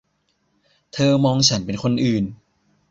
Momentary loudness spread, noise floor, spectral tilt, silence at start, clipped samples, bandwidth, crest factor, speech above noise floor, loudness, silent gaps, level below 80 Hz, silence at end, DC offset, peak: 10 LU; -68 dBFS; -5 dB/octave; 0.95 s; under 0.1%; 7.8 kHz; 18 dB; 49 dB; -19 LUFS; none; -52 dBFS; 0.55 s; under 0.1%; -2 dBFS